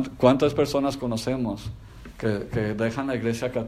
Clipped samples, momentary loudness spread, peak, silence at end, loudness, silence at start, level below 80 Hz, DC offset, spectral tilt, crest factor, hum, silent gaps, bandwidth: under 0.1%; 14 LU; -4 dBFS; 0 s; -25 LUFS; 0 s; -46 dBFS; under 0.1%; -6.5 dB/octave; 22 dB; none; none; 15.5 kHz